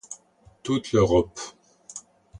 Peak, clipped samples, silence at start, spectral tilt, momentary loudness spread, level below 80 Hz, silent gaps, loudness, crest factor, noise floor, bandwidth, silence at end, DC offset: -8 dBFS; under 0.1%; 0.1 s; -6 dB/octave; 21 LU; -46 dBFS; none; -23 LUFS; 18 dB; -56 dBFS; 11 kHz; 0 s; under 0.1%